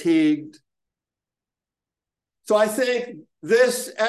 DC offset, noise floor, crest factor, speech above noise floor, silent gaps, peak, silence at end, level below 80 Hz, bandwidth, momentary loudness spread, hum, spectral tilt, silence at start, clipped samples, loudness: under 0.1%; -89 dBFS; 18 dB; 69 dB; none; -6 dBFS; 0 s; -78 dBFS; 12.5 kHz; 11 LU; none; -4 dB/octave; 0 s; under 0.1%; -21 LUFS